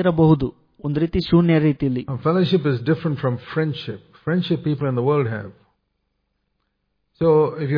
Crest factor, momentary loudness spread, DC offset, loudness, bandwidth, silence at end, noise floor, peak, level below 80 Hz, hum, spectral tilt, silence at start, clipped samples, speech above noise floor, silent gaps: 16 dB; 12 LU; under 0.1%; -20 LUFS; 5.2 kHz; 0 s; -72 dBFS; -4 dBFS; -44 dBFS; 50 Hz at -50 dBFS; -10 dB/octave; 0 s; under 0.1%; 53 dB; none